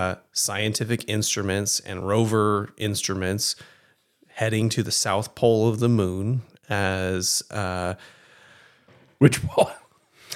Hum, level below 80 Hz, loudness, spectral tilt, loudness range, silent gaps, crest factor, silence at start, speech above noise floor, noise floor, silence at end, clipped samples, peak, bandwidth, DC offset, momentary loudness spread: none; -60 dBFS; -24 LUFS; -4.5 dB/octave; 2 LU; none; 24 dB; 0 s; 38 dB; -61 dBFS; 0 s; under 0.1%; 0 dBFS; 16.5 kHz; under 0.1%; 8 LU